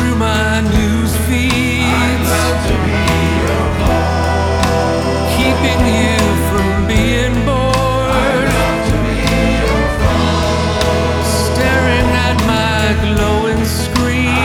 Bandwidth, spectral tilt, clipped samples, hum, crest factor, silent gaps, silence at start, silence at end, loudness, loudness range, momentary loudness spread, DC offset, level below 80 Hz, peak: 17 kHz; -5 dB/octave; under 0.1%; none; 12 dB; none; 0 s; 0 s; -14 LUFS; 1 LU; 2 LU; under 0.1%; -20 dBFS; 0 dBFS